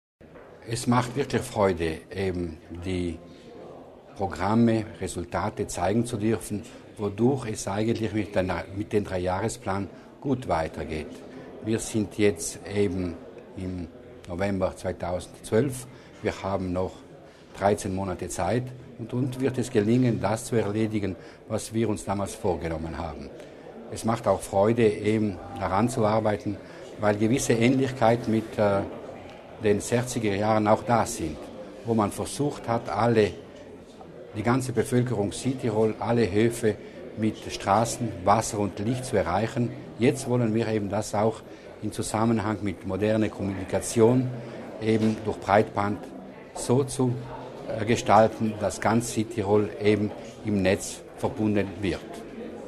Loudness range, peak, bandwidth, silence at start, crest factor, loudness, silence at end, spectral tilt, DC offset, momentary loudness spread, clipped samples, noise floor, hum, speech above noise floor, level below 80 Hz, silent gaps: 5 LU; -4 dBFS; 13.5 kHz; 0.2 s; 22 dB; -26 LUFS; 0 s; -6 dB/octave; under 0.1%; 16 LU; under 0.1%; -48 dBFS; none; 22 dB; -52 dBFS; none